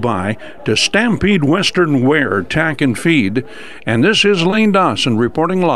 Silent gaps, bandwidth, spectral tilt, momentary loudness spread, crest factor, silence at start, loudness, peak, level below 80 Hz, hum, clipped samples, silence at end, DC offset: none; 13 kHz; -5 dB/octave; 8 LU; 14 dB; 0 s; -14 LUFS; 0 dBFS; -44 dBFS; none; under 0.1%; 0 s; 2%